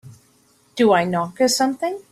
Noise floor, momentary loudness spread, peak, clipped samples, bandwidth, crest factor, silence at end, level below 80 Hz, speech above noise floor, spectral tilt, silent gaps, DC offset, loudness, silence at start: -58 dBFS; 9 LU; -4 dBFS; under 0.1%; 15.5 kHz; 18 dB; 0.1 s; -64 dBFS; 39 dB; -4 dB/octave; none; under 0.1%; -19 LUFS; 0.05 s